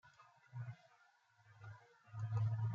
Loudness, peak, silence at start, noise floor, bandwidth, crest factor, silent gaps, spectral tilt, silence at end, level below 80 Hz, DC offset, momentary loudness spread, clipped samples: -45 LUFS; -30 dBFS; 0.05 s; -73 dBFS; 6.8 kHz; 16 dB; none; -8 dB/octave; 0 s; -78 dBFS; under 0.1%; 23 LU; under 0.1%